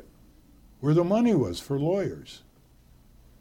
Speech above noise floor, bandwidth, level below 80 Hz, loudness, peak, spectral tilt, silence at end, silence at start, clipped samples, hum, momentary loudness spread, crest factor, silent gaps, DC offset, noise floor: 32 dB; 16.5 kHz; -56 dBFS; -25 LUFS; -12 dBFS; -7.5 dB/octave; 1.05 s; 0.8 s; under 0.1%; none; 14 LU; 16 dB; none; under 0.1%; -57 dBFS